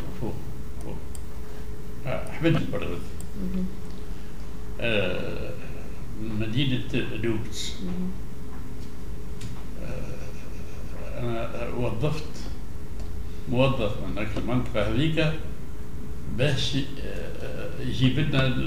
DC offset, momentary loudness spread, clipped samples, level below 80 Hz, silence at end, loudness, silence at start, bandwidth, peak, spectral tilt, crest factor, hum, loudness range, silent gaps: 5%; 15 LU; under 0.1%; -38 dBFS; 0 s; -30 LUFS; 0 s; 16 kHz; -8 dBFS; -6 dB/octave; 20 dB; none; 7 LU; none